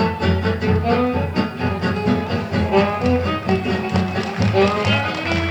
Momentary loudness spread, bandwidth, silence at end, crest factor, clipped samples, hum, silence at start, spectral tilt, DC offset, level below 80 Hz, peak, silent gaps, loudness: 5 LU; 9.8 kHz; 0 s; 16 dB; under 0.1%; none; 0 s; -7 dB/octave; under 0.1%; -38 dBFS; -4 dBFS; none; -19 LUFS